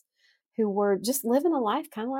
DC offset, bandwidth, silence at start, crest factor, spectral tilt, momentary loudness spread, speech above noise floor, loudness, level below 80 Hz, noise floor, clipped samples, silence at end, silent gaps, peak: under 0.1%; 17 kHz; 0.6 s; 14 dB; -4.5 dB/octave; 6 LU; 43 dB; -26 LUFS; -78 dBFS; -69 dBFS; under 0.1%; 0 s; none; -12 dBFS